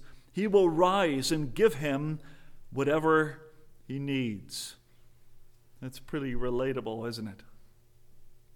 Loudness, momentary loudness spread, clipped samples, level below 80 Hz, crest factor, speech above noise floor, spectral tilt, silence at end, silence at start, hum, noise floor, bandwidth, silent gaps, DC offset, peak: -29 LUFS; 17 LU; under 0.1%; -50 dBFS; 20 dB; 27 dB; -5.5 dB/octave; 0.15 s; 0 s; none; -55 dBFS; 18 kHz; none; under 0.1%; -10 dBFS